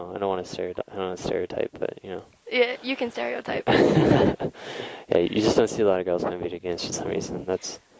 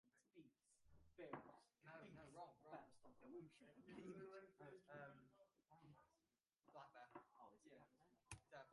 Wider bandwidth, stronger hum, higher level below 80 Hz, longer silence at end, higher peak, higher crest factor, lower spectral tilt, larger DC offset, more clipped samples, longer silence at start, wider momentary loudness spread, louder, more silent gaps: second, 8 kHz vs 11 kHz; neither; first, -50 dBFS vs -86 dBFS; first, 0.2 s vs 0 s; first, -6 dBFS vs -38 dBFS; second, 20 dB vs 26 dB; about the same, -5.5 dB/octave vs -5.5 dB/octave; neither; neither; about the same, 0 s vs 0.05 s; first, 13 LU vs 10 LU; first, -25 LUFS vs -63 LUFS; neither